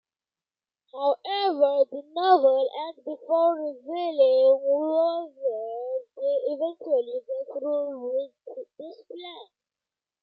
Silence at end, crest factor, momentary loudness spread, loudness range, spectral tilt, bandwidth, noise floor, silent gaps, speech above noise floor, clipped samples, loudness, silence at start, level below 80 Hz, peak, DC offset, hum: 0.8 s; 18 dB; 21 LU; 8 LU; -5.5 dB/octave; 5.6 kHz; under -90 dBFS; none; over 65 dB; under 0.1%; -25 LUFS; 0.95 s; under -90 dBFS; -8 dBFS; under 0.1%; none